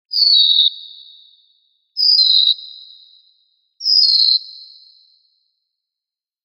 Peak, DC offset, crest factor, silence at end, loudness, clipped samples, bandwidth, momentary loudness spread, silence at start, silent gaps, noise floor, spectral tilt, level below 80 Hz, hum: -2 dBFS; under 0.1%; 16 dB; 1.85 s; -11 LUFS; under 0.1%; 15.5 kHz; 21 LU; 0.1 s; none; -88 dBFS; 6.5 dB/octave; -90 dBFS; none